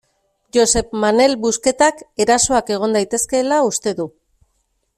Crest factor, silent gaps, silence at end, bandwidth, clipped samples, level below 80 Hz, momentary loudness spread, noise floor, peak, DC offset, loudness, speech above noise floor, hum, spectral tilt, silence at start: 16 dB; none; 0.9 s; 15 kHz; under 0.1%; -44 dBFS; 7 LU; -67 dBFS; -2 dBFS; under 0.1%; -16 LUFS; 51 dB; none; -2.5 dB/octave; 0.55 s